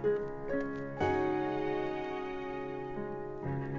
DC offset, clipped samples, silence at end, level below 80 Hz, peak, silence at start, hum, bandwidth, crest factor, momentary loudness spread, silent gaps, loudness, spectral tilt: 0.2%; under 0.1%; 0 s; -56 dBFS; -20 dBFS; 0 s; none; 7.6 kHz; 16 dB; 8 LU; none; -36 LUFS; -8 dB/octave